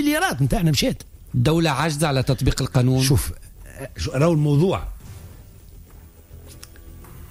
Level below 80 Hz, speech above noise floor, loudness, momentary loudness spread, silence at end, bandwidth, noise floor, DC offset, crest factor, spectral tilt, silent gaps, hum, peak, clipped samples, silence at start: -36 dBFS; 25 dB; -20 LUFS; 23 LU; 0.05 s; 16 kHz; -45 dBFS; under 0.1%; 14 dB; -5.5 dB/octave; none; none; -8 dBFS; under 0.1%; 0 s